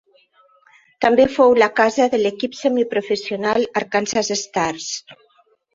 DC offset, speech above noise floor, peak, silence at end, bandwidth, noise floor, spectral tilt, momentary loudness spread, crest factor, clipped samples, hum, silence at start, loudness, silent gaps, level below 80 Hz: under 0.1%; 41 dB; -2 dBFS; 0.6 s; 7.8 kHz; -59 dBFS; -3.5 dB/octave; 9 LU; 18 dB; under 0.1%; none; 1 s; -18 LUFS; none; -58 dBFS